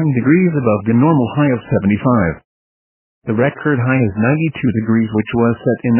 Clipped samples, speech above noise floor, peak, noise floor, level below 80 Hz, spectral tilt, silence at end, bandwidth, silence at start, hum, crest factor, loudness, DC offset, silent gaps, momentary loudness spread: under 0.1%; over 76 dB; 0 dBFS; under -90 dBFS; -42 dBFS; -12.5 dB/octave; 0 s; 3.2 kHz; 0 s; none; 14 dB; -15 LUFS; under 0.1%; 2.44-3.22 s; 5 LU